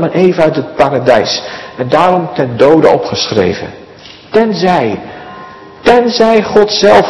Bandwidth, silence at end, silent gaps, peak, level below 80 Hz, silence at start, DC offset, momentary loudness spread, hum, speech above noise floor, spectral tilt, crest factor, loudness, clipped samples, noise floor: 12 kHz; 0 s; none; 0 dBFS; -44 dBFS; 0 s; 0.3%; 15 LU; none; 25 dB; -5 dB/octave; 10 dB; -10 LUFS; 3%; -34 dBFS